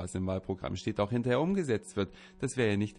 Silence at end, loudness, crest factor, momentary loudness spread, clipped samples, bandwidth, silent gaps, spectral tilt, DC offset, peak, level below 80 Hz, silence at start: 0 s; -32 LUFS; 16 dB; 7 LU; under 0.1%; 11 kHz; none; -6 dB/octave; under 0.1%; -16 dBFS; -56 dBFS; 0 s